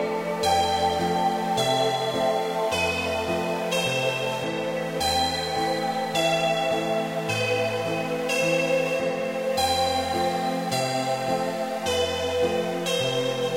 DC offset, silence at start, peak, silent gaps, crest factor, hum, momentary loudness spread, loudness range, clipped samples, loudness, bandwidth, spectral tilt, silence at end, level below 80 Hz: under 0.1%; 0 s; -12 dBFS; none; 14 dB; none; 4 LU; 1 LU; under 0.1%; -25 LUFS; 16 kHz; -3.5 dB/octave; 0 s; -54 dBFS